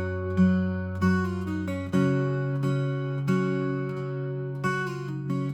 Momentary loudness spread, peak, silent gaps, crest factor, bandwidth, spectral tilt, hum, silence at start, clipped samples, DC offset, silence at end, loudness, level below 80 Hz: 8 LU; -12 dBFS; none; 16 dB; 9.2 kHz; -8 dB/octave; none; 0 s; under 0.1%; under 0.1%; 0 s; -27 LUFS; -64 dBFS